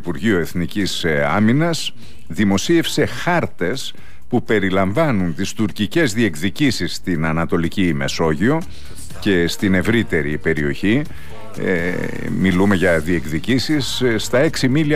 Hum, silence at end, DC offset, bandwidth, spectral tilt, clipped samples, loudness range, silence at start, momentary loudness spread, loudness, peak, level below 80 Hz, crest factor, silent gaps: none; 0 s; 5%; 15.5 kHz; -5.5 dB/octave; under 0.1%; 1 LU; 0.05 s; 8 LU; -18 LUFS; -6 dBFS; -42 dBFS; 14 dB; none